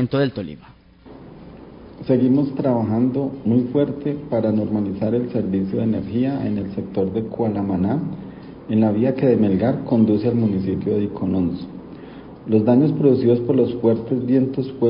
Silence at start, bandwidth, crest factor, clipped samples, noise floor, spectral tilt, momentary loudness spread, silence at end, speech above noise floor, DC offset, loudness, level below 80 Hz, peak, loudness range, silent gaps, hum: 0 s; 5.4 kHz; 16 dB; under 0.1%; -43 dBFS; -13.5 dB/octave; 14 LU; 0 s; 24 dB; under 0.1%; -20 LUFS; -48 dBFS; -4 dBFS; 3 LU; none; none